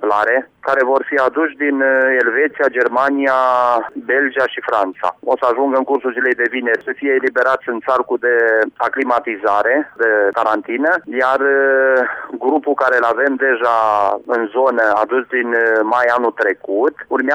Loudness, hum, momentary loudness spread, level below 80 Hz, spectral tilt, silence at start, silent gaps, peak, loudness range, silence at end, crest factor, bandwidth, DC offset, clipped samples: -15 LUFS; none; 5 LU; -64 dBFS; -5 dB/octave; 0 s; none; -4 dBFS; 2 LU; 0 s; 12 dB; 9.4 kHz; under 0.1%; under 0.1%